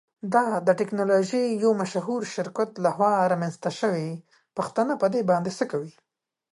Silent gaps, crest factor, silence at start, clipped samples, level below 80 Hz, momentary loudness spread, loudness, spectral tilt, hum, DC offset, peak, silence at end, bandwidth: none; 16 dB; 0.25 s; under 0.1%; -74 dBFS; 9 LU; -25 LUFS; -6 dB/octave; none; under 0.1%; -8 dBFS; 0.65 s; 11.5 kHz